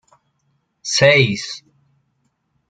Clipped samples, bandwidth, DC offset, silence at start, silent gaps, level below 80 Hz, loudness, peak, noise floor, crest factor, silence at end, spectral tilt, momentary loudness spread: under 0.1%; 9.4 kHz; under 0.1%; 0.85 s; none; -56 dBFS; -15 LUFS; -2 dBFS; -68 dBFS; 18 dB; 1.1 s; -3.5 dB/octave; 20 LU